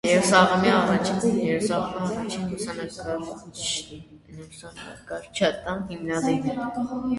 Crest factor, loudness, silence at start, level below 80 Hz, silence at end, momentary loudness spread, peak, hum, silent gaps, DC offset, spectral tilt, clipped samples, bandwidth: 22 dB; -24 LUFS; 0.05 s; -54 dBFS; 0 s; 22 LU; -4 dBFS; none; none; under 0.1%; -4.5 dB/octave; under 0.1%; 11.5 kHz